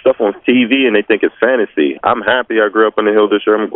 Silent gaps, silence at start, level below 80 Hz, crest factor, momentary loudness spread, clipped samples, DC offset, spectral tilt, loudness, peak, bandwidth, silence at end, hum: none; 0.05 s; -56 dBFS; 12 dB; 3 LU; under 0.1%; under 0.1%; -2 dB/octave; -13 LUFS; 0 dBFS; 4 kHz; 0 s; none